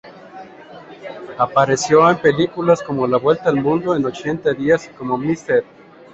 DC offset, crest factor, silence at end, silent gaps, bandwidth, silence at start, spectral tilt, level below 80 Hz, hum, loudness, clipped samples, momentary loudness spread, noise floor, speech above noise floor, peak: under 0.1%; 16 dB; 0.5 s; none; 8.2 kHz; 0.05 s; -5.5 dB/octave; -54 dBFS; none; -17 LUFS; under 0.1%; 20 LU; -39 dBFS; 22 dB; -2 dBFS